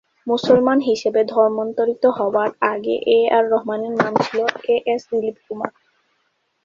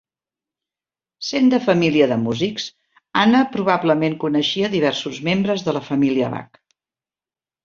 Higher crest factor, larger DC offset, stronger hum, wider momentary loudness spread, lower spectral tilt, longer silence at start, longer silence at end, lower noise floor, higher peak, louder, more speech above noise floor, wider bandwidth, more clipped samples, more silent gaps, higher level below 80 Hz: about the same, 18 dB vs 18 dB; neither; neither; about the same, 9 LU vs 9 LU; about the same, -5.5 dB/octave vs -5.5 dB/octave; second, 0.25 s vs 1.2 s; second, 0.95 s vs 1.2 s; second, -68 dBFS vs under -90 dBFS; about the same, -2 dBFS vs -2 dBFS; about the same, -19 LUFS vs -19 LUFS; second, 50 dB vs over 72 dB; about the same, 7.4 kHz vs 7.4 kHz; neither; neither; about the same, -62 dBFS vs -60 dBFS